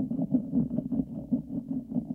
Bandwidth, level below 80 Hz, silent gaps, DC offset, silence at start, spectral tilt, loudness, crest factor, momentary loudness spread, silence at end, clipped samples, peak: 1.5 kHz; -54 dBFS; none; under 0.1%; 0 s; -12.5 dB/octave; -31 LUFS; 16 dB; 6 LU; 0 s; under 0.1%; -14 dBFS